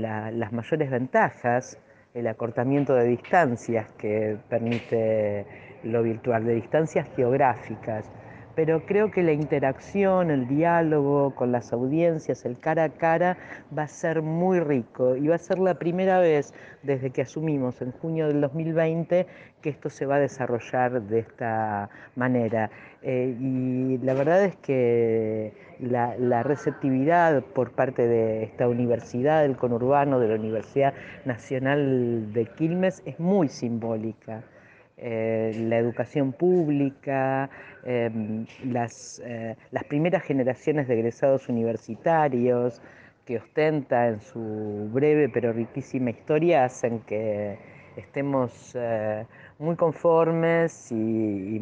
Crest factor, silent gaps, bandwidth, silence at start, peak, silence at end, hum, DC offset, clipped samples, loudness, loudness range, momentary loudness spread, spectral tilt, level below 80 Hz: 18 dB; none; 8.8 kHz; 0 s; -6 dBFS; 0 s; none; under 0.1%; under 0.1%; -25 LUFS; 4 LU; 11 LU; -8 dB/octave; -66 dBFS